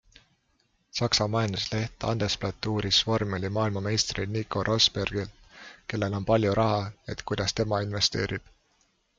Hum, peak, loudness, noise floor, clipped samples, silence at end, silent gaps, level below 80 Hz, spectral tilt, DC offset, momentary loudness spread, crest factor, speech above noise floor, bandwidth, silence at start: none; -8 dBFS; -27 LUFS; -70 dBFS; under 0.1%; 0.8 s; none; -50 dBFS; -4.5 dB/octave; under 0.1%; 13 LU; 20 dB; 43 dB; 7.8 kHz; 0.95 s